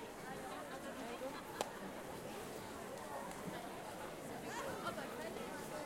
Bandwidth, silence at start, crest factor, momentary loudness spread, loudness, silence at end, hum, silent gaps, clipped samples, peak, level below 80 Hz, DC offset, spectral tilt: 16.5 kHz; 0 s; 26 dB; 4 LU; -47 LUFS; 0 s; none; none; under 0.1%; -20 dBFS; -70 dBFS; under 0.1%; -4 dB/octave